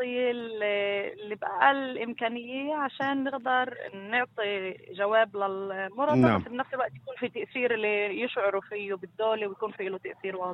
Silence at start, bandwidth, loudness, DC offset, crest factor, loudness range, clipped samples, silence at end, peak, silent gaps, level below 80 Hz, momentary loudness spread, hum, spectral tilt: 0 s; 8 kHz; -29 LUFS; under 0.1%; 22 dB; 2 LU; under 0.1%; 0 s; -8 dBFS; none; -68 dBFS; 11 LU; none; -7.5 dB/octave